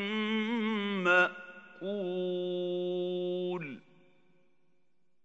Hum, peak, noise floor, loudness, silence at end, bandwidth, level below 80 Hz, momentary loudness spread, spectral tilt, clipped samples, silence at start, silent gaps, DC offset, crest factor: none; -12 dBFS; -80 dBFS; -32 LUFS; 1.45 s; 7.8 kHz; -88 dBFS; 17 LU; -6 dB/octave; under 0.1%; 0 s; none; under 0.1%; 22 dB